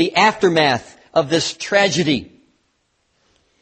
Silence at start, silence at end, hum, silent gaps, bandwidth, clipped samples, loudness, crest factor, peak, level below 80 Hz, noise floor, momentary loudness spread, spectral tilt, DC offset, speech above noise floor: 0 s; 1.35 s; none; none; 8.8 kHz; under 0.1%; -17 LUFS; 18 dB; -2 dBFS; -56 dBFS; -66 dBFS; 7 LU; -4 dB/octave; under 0.1%; 50 dB